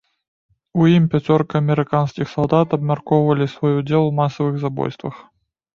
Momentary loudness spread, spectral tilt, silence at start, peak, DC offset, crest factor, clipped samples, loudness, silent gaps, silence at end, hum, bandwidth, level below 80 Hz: 9 LU; -9 dB/octave; 0.75 s; -2 dBFS; under 0.1%; 18 dB; under 0.1%; -18 LUFS; none; 0.55 s; none; 6.8 kHz; -54 dBFS